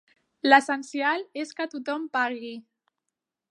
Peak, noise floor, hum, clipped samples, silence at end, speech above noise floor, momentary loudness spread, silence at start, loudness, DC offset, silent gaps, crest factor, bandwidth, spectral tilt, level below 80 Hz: -2 dBFS; -85 dBFS; none; under 0.1%; 0.9 s; 60 dB; 17 LU; 0.45 s; -25 LUFS; under 0.1%; none; 26 dB; 11.5 kHz; -2 dB/octave; -86 dBFS